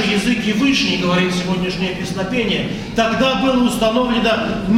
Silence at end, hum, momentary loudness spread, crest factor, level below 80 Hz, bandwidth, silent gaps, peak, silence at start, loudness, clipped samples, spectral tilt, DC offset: 0 s; none; 5 LU; 14 dB; -38 dBFS; 15.5 kHz; none; -4 dBFS; 0 s; -17 LUFS; under 0.1%; -5 dB/octave; under 0.1%